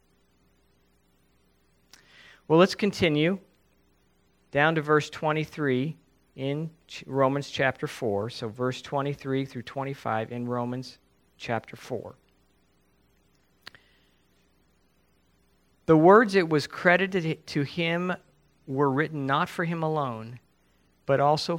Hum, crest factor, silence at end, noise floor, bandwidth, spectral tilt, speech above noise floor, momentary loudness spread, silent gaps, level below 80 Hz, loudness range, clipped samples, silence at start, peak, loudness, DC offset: none; 24 dB; 0 s; -67 dBFS; 16 kHz; -6.5 dB/octave; 41 dB; 16 LU; none; -64 dBFS; 13 LU; under 0.1%; 2.5 s; -4 dBFS; -26 LUFS; under 0.1%